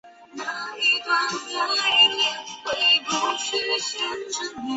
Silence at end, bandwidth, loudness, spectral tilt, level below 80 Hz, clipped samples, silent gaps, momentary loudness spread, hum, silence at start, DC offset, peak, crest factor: 0 s; 8.2 kHz; -21 LUFS; 0 dB/octave; -68 dBFS; under 0.1%; none; 14 LU; none; 0.05 s; under 0.1%; -6 dBFS; 18 dB